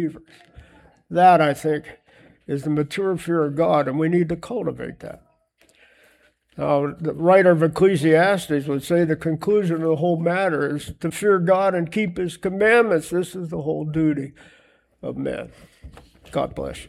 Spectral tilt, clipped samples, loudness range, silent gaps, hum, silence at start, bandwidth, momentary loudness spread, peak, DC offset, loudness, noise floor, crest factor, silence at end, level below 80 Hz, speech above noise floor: -6.5 dB/octave; under 0.1%; 7 LU; none; none; 0 s; 14.5 kHz; 13 LU; -2 dBFS; under 0.1%; -20 LUFS; -60 dBFS; 18 dB; 0 s; -52 dBFS; 40 dB